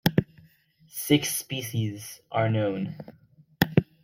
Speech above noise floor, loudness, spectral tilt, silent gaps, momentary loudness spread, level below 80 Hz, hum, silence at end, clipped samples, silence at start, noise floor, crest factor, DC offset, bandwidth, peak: 32 dB; -27 LUFS; -5 dB/octave; none; 16 LU; -56 dBFS; none; 0.2 s; under 0.1%; 0.05 s; -59 dBFS; 24 dB; under 0.1%; 16.5 kHz; -2 dBFS